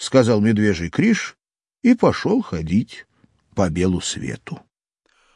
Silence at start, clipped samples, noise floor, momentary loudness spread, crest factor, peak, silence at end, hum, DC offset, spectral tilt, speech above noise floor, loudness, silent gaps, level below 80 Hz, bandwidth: 0 s; under 0.1%; -67 dBFS; 17 LU; 18 dB; -2 dBFS; 0.8 s; none; under 0.1%; -6 dB/octave; 49 dB; -19 LUFS; none; -50 dBFS; 11 kHz